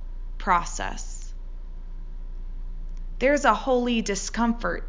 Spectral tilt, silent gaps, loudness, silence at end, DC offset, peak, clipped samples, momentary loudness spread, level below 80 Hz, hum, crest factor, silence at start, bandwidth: -4 dB/octave; none; -24 LUFS; 0 s; under 0.1%; -4 dBFS; under 0.1%; 22 LU; -34 dBFS; none; 22 dB; 0 s; 7.6 kHz